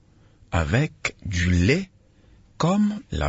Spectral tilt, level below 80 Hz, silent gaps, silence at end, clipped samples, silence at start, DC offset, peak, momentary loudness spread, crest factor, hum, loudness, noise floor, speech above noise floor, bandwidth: -6 dB/octave; -40 dBFS; none; 0 s; under 0.1%; 0.5 s; under 0.1%; -8 dBFS; 8 LU; 16 dB; none; -23 LUFS; -54 dBFS; 32 dB; 8 kHz